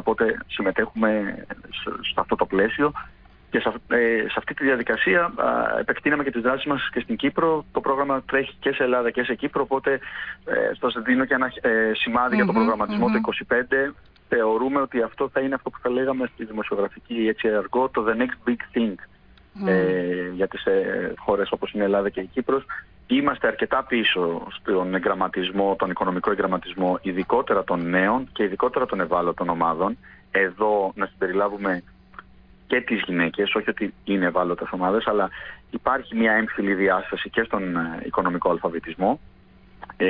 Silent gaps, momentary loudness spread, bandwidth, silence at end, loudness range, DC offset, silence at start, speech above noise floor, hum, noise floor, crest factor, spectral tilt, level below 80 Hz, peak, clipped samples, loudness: none; 7 LU; 5.2 kHz; 0 s; 3 LU; under 0.1%; 0 s; 27 dB; none; -50 dBFS; 16 dB; -9 dB/octave; -54 dBFS; -8 dBFS; under 0.1%; -23 LUFS